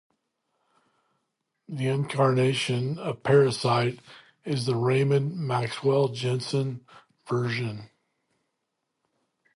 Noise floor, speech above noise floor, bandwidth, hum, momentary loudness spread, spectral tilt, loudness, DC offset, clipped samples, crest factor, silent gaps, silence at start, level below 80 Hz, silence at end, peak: -81 dBFS; 56 dB; 11.5 kHz; none; 11 LU; -6.5 dB/octave; -26 LUFS; under 0.1%; under 0.1%; 20 dB; none; 1.7 s; -68 dBFS; 1.7 s; -8 dBFS